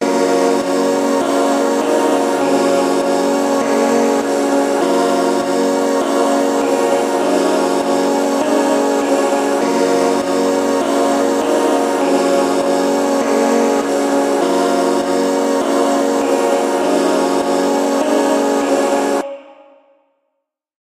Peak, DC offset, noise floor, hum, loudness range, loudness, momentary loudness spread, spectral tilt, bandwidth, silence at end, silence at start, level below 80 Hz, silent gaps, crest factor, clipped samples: -2 dBFS; under 0.1%; -74 dBFS; none; 0 LU; -15 LUFS; 2 LU; -4 dB/octave; 15 kHz; 1.35 s; 0 s; -62 dBFS; none; 12 dB; under 0.1%